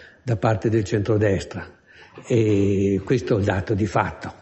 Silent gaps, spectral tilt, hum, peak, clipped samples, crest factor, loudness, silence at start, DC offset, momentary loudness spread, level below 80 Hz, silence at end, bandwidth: none; -7.5 dB/octave; none; -4 dBFS; under 0.1%; 18 dB; -22 LUFS; 0 s; under 0.1%; 8 LU; -42 dBFS; 0.1 s; 8.4 kHz